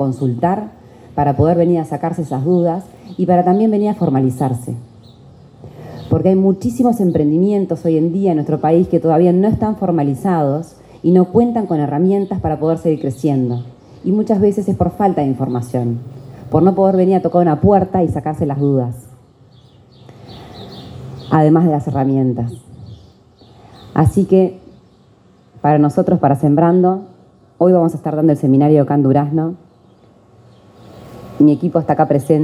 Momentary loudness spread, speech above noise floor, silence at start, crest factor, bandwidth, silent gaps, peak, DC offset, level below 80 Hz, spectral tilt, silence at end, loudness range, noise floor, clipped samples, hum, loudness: 14 LU; 35 dB; 0 s; 16 dB; 13 kHz; none; 0 dBFS; under 0.1%; -44 dBFS; -9.5 dB/octave; 0 s; 4 LU; -49 dBFS; under 0.1%; none; -15 LUFS